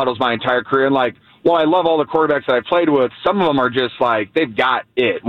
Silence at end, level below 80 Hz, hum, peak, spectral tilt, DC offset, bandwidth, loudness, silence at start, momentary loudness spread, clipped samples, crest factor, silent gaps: 0 s; -56 dBFS; none; -4 dBFS; -7 dB/octave; under 0.1%; 6 kHz; -17 LUFS; 0 s; 4 LU; under 0.1%; 12 dB; none